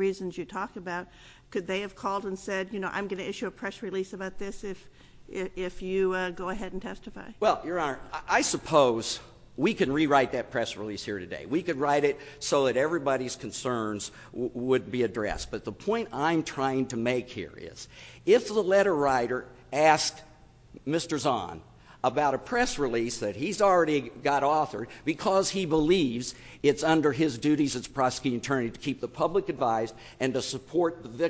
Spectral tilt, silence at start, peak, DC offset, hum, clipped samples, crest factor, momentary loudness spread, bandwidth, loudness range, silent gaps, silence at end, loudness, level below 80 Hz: -4.5 dB/octave; 0 s; -8 dBFS; under 0.1%; none; under 0.1%; 22 dB; 13 LU; 8 kHz; 7 LU; none; 0 s; -28 LUFS; -54 dBFS